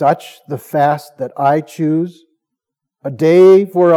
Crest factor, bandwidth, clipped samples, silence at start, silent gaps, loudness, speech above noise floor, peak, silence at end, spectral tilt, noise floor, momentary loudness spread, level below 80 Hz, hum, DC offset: 14 dB; 14.5 kHz; under 0.1%; 0 s; none; -13 LUFS; 67 dB; 0 dBFS; 0 s; -7.5 dB/octave; -80 dBFS; 19 LU; -78 dBFS; none; under 0.1%